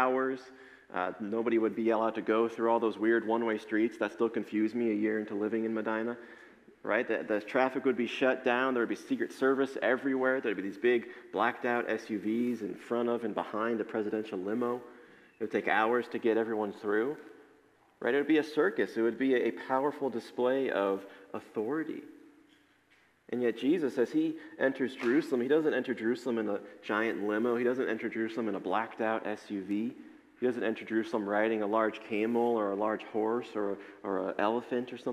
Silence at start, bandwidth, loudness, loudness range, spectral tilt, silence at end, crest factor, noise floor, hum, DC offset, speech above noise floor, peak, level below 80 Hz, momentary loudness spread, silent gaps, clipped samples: 0 s; 12.5 kHz; -32 LUFS; 4 LU; -6 dB/octave; 0 s; 20 dB; -67 dBFS; none; under 0.1%; 36 dB; -12 dBFS; -82 dBFS; 7 LU; none; under 0.1%